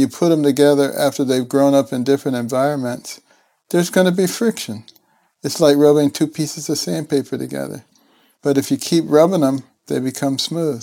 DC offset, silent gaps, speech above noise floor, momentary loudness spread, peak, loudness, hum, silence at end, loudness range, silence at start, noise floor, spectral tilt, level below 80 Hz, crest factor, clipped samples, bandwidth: under 0.1%; none; 39 dB; 13 LU; 0 dBFS; -17 LUFS; none; 0 s; 3 LU; 0 s; -56 dBFS; -5.5 dB/octave; -66 dBFS; 16 dB; under 0.1%; 17 kHz